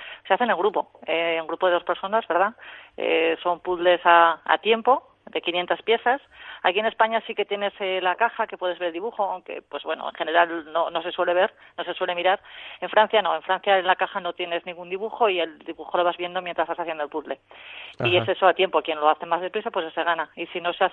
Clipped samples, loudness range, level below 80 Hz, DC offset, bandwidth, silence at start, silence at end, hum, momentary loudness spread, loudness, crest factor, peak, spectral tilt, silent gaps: under 0.1%; 5 LU; -68 dBFS; under 0.1%; 4.2 kHz; 0 s; 0 s; none; 11 LU; -23 LUFS; 22 dB; -2 dBFS; -7 dB/octave; none